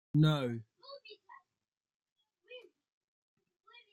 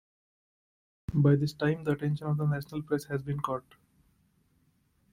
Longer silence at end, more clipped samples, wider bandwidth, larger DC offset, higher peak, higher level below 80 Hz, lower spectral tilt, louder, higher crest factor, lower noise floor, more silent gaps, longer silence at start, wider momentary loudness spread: second, 1.35 s vs 1.55 s; neither; second, 11.5 kHz vs 15 kHz; neither; second, -18 dBFS vs -12 dBFS; second, -68 dBFS vs -60 dBFS; about the same, -8 dB/octave vs -8 dB/octave; about the same, -32 LUFS vs -30 LUFS; about the same, 22 dB vs 20 dB; first, under -90 dBFS vs -70 dBFS; first, 1.77-1.81 s, 1.95-2.00 s, 2.12-2.16 s vs none; second, 0.15 s vs 1.1 s; first, 25 LU vs 10 LU